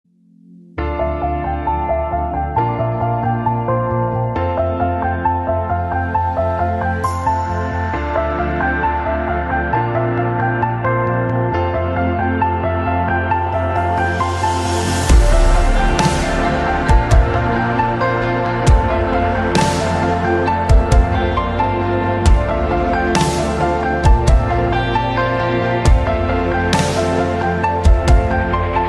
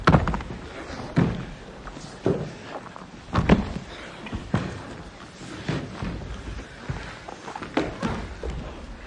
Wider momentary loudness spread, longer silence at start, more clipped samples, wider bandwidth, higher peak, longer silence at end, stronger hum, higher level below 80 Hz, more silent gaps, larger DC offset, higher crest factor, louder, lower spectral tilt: second, 5 LU vs 17 LU; first, 0.5 s vs 0 s; neither; first, 12 kHz vs 10.5 kHz; about the same, 0 dBFS vs -2 dBFS; about the same, 0 s vs 0 s; neither; first, -20 dBFS vs -38 dBFS; neither; neither; second, 16 dB vs 26 dB; first, -17 LUFS vs -29 LUFS; about the same, -6 dB/octave vs -7 dB/octave